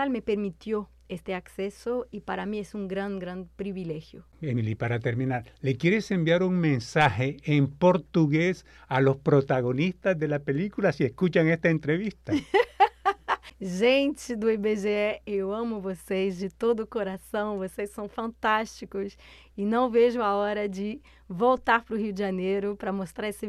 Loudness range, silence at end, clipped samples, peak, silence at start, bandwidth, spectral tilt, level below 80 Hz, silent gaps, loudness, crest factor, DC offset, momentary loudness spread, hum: 8 LU; 0 s; under 0.1%; -8 dBFS; 0 s; 13.5 kHz; -7 dB/octave; -56 dBFS; none; -27 LUFS; 20 dB; under 0.1%; 12 LU; none